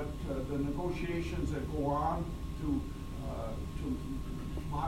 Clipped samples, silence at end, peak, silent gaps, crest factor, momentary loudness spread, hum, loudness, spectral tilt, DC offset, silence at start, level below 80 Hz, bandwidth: under 0.1%; 0 s; -20 dBFS; none; 14 dB; 7 LU; none; -37 LUFS; -7.5 dB/octave; under 0.1%; 0 s; -42 dBFS; 16 kHz